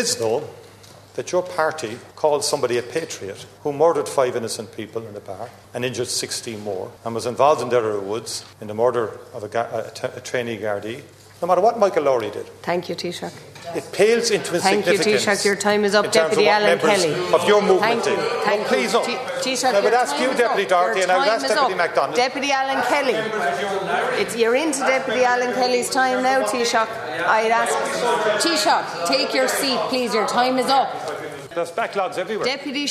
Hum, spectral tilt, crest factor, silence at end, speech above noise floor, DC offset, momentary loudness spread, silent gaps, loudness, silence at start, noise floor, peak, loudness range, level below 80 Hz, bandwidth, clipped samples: none; -3 dB/octave; 20 dB; 0 s; 24 dB; under 0.1%; 13 LU; none; -20 LUFS; 0 s; -45 dBFS; 0 dBFS; 7 LU; -68 dBFS; 14 kHz; under 0.1%